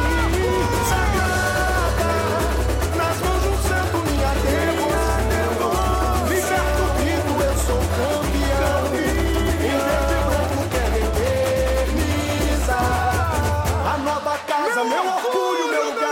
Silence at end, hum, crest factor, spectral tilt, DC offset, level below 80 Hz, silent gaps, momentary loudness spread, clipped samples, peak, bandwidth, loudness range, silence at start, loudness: 0 s; none; 12 dB; -5 dB/octave; under 0.1%; -26 dBFS; none; 2 LU; under 0.1%; -8 dBFS; 16.5 kHz; 1 LU; 0 s; -20 LUFS